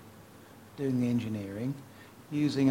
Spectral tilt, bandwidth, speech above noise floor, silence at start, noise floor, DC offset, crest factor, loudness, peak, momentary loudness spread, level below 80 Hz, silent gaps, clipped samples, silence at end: -7.5 dB/octave; 16.5 kHz; 23 dB; 0 s; -53 dBFS; under 0.1%; 18 dB; -32 LUFS; -14 dBFS; 23 LU; -66 dBFS; none; under 0.1%; 0 s